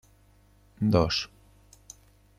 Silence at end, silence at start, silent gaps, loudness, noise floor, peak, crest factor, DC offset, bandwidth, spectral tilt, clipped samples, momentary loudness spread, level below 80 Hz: 1.1 s; 0.8 s; none; -26 LUFS; -60 dBFS; -8 dBFS; 24 dB; under 0.1%; 14.5 kHz; -6 dB/octave; under 0.1%; 26 LU; -50 dBFS